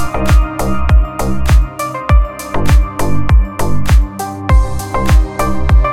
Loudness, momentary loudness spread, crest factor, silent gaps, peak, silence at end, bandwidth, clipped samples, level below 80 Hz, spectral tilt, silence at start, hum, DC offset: -14 LUFS; 6 LU; 10 dB; none; 0 dBFS; 0 s; 15 kHz; under 0.1%; -12 dBFS; -6.5 dB/octave; 0 s; none; under 0.1%